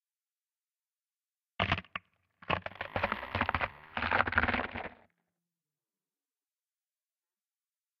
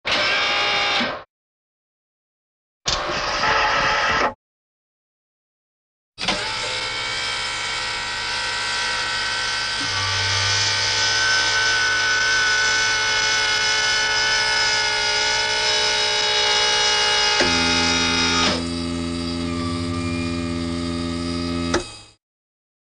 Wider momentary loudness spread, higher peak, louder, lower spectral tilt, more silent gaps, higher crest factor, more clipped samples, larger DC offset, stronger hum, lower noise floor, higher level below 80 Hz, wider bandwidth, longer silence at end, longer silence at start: first, 16 LU vs 9 LU; second, -8 dBFS vs -4 dBFS; second, -33 LUFS vs -19 LUFS; first, -6.5 dB/octave vs -1.5 dB/octave; second, none vs 1.30-2.81 s, 4.35-6.12 s; first, 30 dB vs 18 dB; neither; neither; neither; about the same, under -90 dBFS vs under -90 dBFS; second, -54 dBFS vs -44 dBFS; first, 13 kHz vs 10.5 kHz; first, 3.05 s vs 0.9 s; first, 1.6 s vs 0.05 s